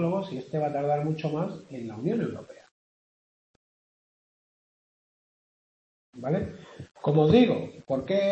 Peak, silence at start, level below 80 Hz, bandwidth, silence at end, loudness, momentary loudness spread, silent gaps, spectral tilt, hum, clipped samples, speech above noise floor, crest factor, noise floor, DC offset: -8 dBFS; 0 s; -62 dBFS; 8.4 kHz; 0 s; -27 LUFS; 18 LU; 2.71-6.13 s; -8.5 dB/octave; none; under 0.1%; over 64 dB; 20 dB; under -90 dBFS; under 0.1%